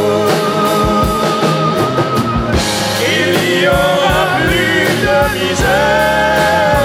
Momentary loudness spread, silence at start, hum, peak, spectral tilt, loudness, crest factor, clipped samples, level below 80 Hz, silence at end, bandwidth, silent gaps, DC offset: 3 LU; 0 s; none; 0 dBFS; -4.5 dB/octave; -12 LUFS; 12 dB; under 0.1%; -28 dBFS; 0 s; 16.5 kHz; none; under 0.1%